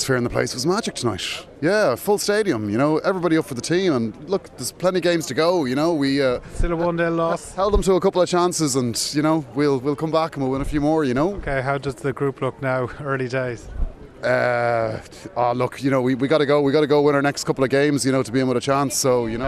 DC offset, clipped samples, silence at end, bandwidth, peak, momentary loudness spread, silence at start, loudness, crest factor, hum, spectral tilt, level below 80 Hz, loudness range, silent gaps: under 0.1%; under 0.1%; 0 s; 14 kHz; -4 dBFS; 7 LU; 0 s; -21 LUFS; 16 dB; none; -5 dB/octave; -36 dBFS; 4 LU; none